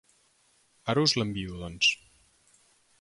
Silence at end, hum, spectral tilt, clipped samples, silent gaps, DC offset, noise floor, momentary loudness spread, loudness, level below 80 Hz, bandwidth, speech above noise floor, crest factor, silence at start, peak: 1.05 s; none; -3.5 dB/octave; under 0.1%; none; under 0.1%; -67 dBFS; 14 LU; -27 LUFS; -56 dBFS; 11.5 kHz; 39 dB; 22 dB; 0.85 s; -10 dBFS